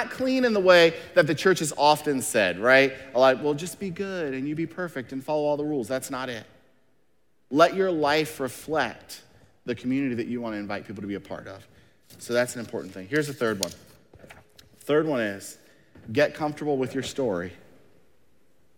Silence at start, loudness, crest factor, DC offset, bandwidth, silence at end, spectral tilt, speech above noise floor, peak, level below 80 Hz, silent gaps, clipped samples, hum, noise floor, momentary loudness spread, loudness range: 0 s; -25 LUFS; 22 dB; under 0.1%; 17.5 kHz; 1.25 s; -4.5 dB/octave; 46 dB; -4 dBFS; -66 dBFS; none; under 0.1%; none; -71 dBFS; 15 LU; 9 LU